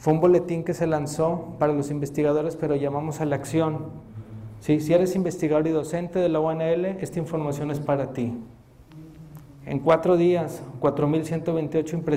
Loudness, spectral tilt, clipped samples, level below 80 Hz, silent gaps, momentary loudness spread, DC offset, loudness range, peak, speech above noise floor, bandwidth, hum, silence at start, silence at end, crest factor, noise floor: -24 LUFS; -7.5 dB/octave; under 0.1%; -54 dBFS; none; 14 LU; under 0.1%; 3 LU; -8 dBFS; 23 dB; 15.5 kHz; none; 0 s; 0 s; 16 dB; -46 dBFS